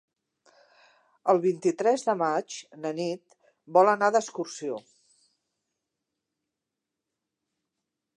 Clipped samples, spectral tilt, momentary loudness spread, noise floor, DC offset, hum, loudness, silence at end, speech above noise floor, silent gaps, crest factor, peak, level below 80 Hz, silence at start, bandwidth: under 0.1%; -5 dB/octave; 14 LU; -86 dBFS; under 0.1%; none; -26 LUFS; 3.35 s; 61 dB; none; 22 dB; -6 dBFS; -86 dBFS; 1.25 s; 11 kHz